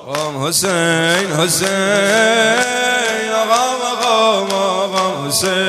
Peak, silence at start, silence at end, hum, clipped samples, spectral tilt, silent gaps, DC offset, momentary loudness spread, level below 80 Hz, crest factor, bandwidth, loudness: 0 dBFS; 0 s; 0 s; none; under 0.1%; -2.5 dB/octave; none; under 0.1%; 5 LU; -60 dBFS; 14 dB; 14 kHz; -14 LUFS